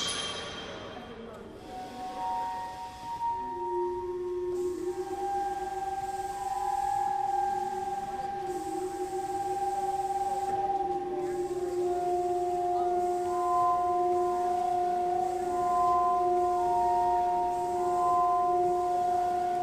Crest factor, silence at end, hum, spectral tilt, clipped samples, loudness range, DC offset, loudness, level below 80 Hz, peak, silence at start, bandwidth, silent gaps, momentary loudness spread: 12 dB; 0 s; none; -4.5 dB/octave; under 0.1%; 7 LU; under 0.1%; -30 LUFS; -58 dBFS; -16 dBFS; 0 s; 15.5 kHz; none; 10 LU